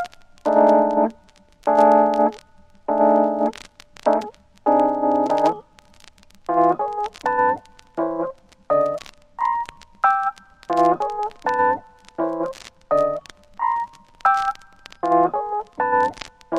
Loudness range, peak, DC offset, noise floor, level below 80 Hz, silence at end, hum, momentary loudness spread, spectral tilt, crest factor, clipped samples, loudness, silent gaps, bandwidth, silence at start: 5 LU; -4 dBFS; under 0.1%; -52 dBFS; -56 dBFS; 0 s; none; 16 LU; -6 dB/octave; 18 dB; under 0.1%; -21 LUFS; none; 11 kHz; 0 s